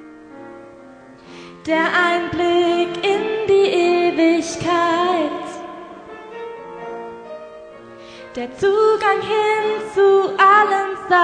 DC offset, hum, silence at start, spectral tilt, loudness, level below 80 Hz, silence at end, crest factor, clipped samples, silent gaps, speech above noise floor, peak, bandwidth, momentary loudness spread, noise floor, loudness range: under 0.1%; none; 0 s; -4 dB/octave; -17 LUFS; -56 dBFS; 0 s; 16 dB; under 0.1%; none; 26 dB; -2 dBFS; 10 kHz; 22 LU; -42 dBFS; 10 LU